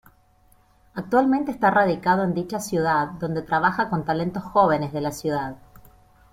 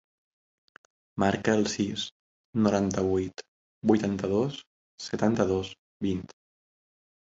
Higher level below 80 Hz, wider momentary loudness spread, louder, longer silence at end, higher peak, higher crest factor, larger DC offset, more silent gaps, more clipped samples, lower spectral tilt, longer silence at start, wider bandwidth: about the same, -54 dBFS vs -54 dBFS; second, 8 LU vs 15 LU; first, -22 LUFS vs -28 LUFS; second, 0.75 s vs 1 s; first, -4 dBFS vs -8 dBFS; about the same, 18 dB vs 20 dB; neither; second, none vs 2.11-2.53 s, 3.48-3.81 s, 4.67-4.98 s, 5.79-6.00 s; neither; about the same, -6 dB/octave vs -5.5 dB/octave; second, 0.95 s vs 1.15 s; first, 16.5 kHz vs 8 kHz